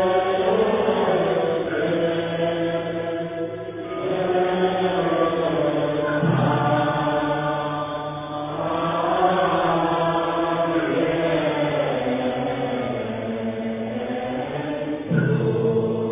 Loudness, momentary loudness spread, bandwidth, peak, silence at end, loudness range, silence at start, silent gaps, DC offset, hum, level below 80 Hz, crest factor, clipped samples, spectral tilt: -23 LUFS; 7 LU; 3.8 kHz; -6 dBFS; 0 s; 4 LU; 0 s; none; under 0.1%; none; -52 dBFS; 16 dB; under 0.1%; -10.5 dB/octave